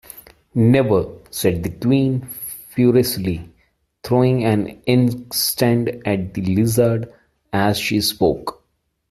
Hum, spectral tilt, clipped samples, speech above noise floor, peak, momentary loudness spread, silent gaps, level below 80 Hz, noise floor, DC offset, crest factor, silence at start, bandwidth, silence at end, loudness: none; -5.5 dB/octave; under 0.1%; 50 dB; -2 dBFS; 12 LU; none; -48 dBFS; -68 dBFS; under 0.1%; 18 dB; 0.15 s; 15.5 kHz; 0.6 s; -19 LUFS